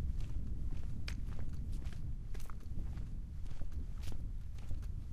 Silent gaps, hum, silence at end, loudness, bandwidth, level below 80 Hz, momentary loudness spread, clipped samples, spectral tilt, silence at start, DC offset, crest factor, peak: none; none; 0 s; -46 LUFS; 9.6 kHz; -42 dBFS; 4 LU; under 0.1%; -6.5 dB/octave; 0 s; under 0.1%; 12 dB; -24 dBFS